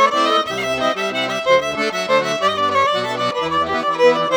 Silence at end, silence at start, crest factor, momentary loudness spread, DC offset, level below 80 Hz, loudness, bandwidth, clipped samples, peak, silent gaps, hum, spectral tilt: 0 s; 0 s; 16 dB; 5 LU; under 0.1%; -54 dBFS; -17 LUFS; over 20 kHz; under 0.1%; -2 dBFS; none; none; -3 dB/octave